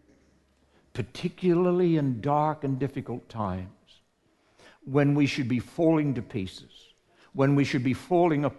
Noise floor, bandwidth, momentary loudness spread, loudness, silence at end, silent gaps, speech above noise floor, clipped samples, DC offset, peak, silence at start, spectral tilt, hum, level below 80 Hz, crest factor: -68 dBFS; 12 kHz; 14 LU; -26 LUFS; 0 s; none; 42 dB; under 0.1%; under 0.1%; -10 dBFS; 0.95 s; -7.5 dB/octave; none; -56 dBFS; 18 dB